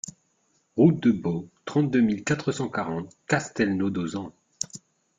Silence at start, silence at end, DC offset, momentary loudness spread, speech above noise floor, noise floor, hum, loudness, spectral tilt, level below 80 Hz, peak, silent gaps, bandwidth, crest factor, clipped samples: 0.05 s; 0.4 s; under 0.1%; 14 LU; 45 dB; -69 dBFS; none; -26 LUFS; -6 dB/octave; -62 dBFS; -6 dBFS; none; 9.6 kHz; 20 dB; under 0.1%